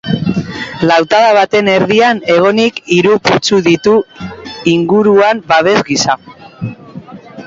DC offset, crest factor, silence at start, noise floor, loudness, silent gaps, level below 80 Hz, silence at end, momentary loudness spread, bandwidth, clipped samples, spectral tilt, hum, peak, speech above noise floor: under 0.1%; 12 dB; 0.05 s; -31 dBFS; -10 LUFS; none; -46 dBFS; 0 s; 16 LU; 7.8 kHz; under 0.1%; -5 dB/octave; none; 0 dBFS; 21 dB